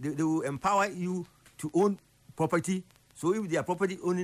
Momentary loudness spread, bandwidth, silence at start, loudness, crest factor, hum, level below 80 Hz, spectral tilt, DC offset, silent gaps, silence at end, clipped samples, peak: 9 LU; 15 kHz; 0 s; -30 LUFS; 14 dB; none; -66 dBFS; -6 dB/octave; under 0.1%; none; 0 s; under 0.1%; -16 dBFS